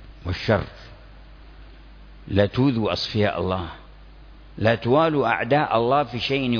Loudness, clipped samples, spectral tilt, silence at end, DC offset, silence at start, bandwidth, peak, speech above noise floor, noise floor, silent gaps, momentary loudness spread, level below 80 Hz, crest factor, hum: -22 LUFS; under 0.1%; -7 dB/octave; 0 s; under 0.1%; 0 s; 5.4 kHz; -4 dBFS; 23 dB; -45 dBFS; none; 10 LU; -44 dBFS; 20 dB; none